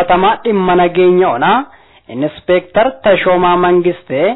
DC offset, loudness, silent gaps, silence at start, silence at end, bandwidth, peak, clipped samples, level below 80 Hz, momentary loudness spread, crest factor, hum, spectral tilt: under 0.1%; -12 LUFS; none; 0 s; 0 s; 4.1 kHz; 0 dBFS; under 0.1%; -42 dBFS; 10 LU; 10 dB; none; -10 dB/octave